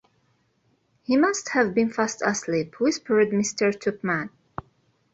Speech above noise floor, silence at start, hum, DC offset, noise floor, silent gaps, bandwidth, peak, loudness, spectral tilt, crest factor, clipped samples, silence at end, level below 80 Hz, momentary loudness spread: 44 dB; 1.1 s; none; under 0.1%; -67 dBFS; none; 8.2 kHz; -6 dBFS; -24 LUFS; -4.5 dB/octave; 18 dB; under 0.1%; 0.85 s; -64 dBFS; 16 LU